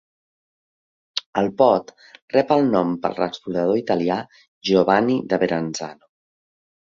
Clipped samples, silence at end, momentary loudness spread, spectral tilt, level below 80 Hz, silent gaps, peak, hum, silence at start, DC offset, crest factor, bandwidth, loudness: under 0.1%; 0.9 s; 11 LU; -5.5 dB/octave; -60 dBFS; 1.26-1.33 s, 2.22-2.28 s, 4.48-4.61 s; -2 dBFS; none; 1.15 s; under 0.1%; 20 dB; 7.6 kHz; -21 LUFS